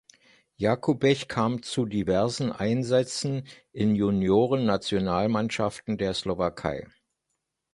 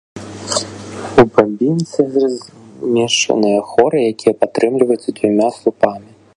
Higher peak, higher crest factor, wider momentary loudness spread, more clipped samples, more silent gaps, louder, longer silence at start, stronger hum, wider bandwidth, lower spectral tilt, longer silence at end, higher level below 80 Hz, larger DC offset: second, -8 dBFS vs 0 dBFS; about the same, 18 dB vs 16 dB; second, 7 LU vs 13 LU; neither; neither; second, -26 LUFS vs -15 LUFS; first, 0.6 s vs 0.15 s; neither; about the same, 11.5 kHz vs 11.5 kHz; first, -6 dB/octave vs -4.5 dB/octave; first, 0.9 s vs 0.35 s; about the same, -52 dBFS vs -48 dBFS; neither